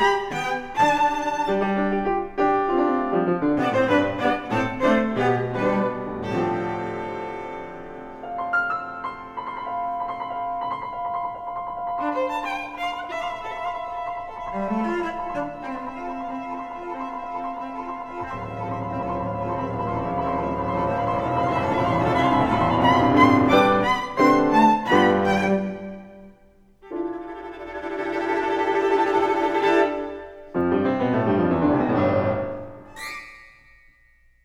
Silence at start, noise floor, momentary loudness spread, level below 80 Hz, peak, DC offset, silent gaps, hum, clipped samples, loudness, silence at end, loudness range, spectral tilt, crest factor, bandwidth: 0 s; -57 dBFS; 14 LU; -48 dBFS; -2 dBFS; under 0.1%; none; none; under 0.1%; -23 LUFS; 0.95 s; 11 LU; -6.5 dB/octave; 20 dB; 15.5 kHz